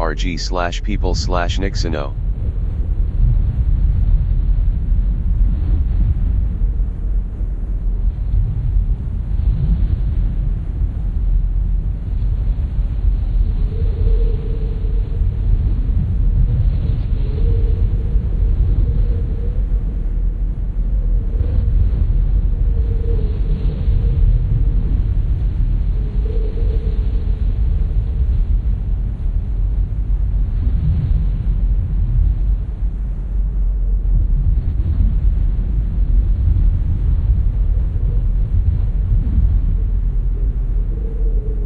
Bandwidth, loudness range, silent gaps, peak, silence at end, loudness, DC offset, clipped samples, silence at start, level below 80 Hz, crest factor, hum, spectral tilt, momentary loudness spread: 7 kHz; 2 LU; none; -2 dBFS; 0 s; -20 LUFS; under 0.1%; under 0.1%; 0 s; -16 dBFS; 12 dB; none; -7.5 dB/octave; 5 LU